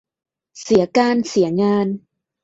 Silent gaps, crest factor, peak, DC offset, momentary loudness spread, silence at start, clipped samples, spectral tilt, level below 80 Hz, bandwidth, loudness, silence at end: none; 16 dB; -2 dBFS; under 0.1%; 11 LU; 0.55 s; under 0.1%; -6 dB/octave; -56 dBFS; 8 kHz; -17 LUFS; 0.45 s